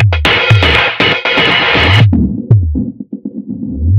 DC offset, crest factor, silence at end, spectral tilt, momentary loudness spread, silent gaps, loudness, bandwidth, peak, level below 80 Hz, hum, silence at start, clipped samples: under 0.1%; 10 dB; 0 s; -6 dB/octave; 15 LU; none; -9 LUFS; 9 kHz; 0 dBFS; -24 dBFS; none; 0 s; 0.4%